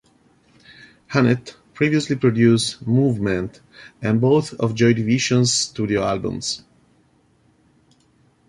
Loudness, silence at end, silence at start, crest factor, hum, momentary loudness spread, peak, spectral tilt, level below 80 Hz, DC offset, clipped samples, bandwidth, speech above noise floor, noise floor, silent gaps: -19 LUFS; 1.9 s; 1.1 s; 18 dB; none; 9 LU; -4 dBFS; -5 dB/octave; -52 dBFS; under 0.1%; under 0.1%; 11.5 kHz; 40 dB; -59 dBFS; none